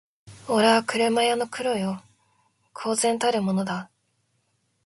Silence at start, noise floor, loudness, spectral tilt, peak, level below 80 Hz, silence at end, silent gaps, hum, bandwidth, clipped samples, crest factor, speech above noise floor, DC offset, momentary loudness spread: 0.25 s; -71 dBFS; -24 LUFS; -4 dB/octave; -4 dBFS; -68 dBFS; 1 s; none; none; 12 kHz; under 0.1%; 20 dB; 48 dB; under 0.1%; 14 LU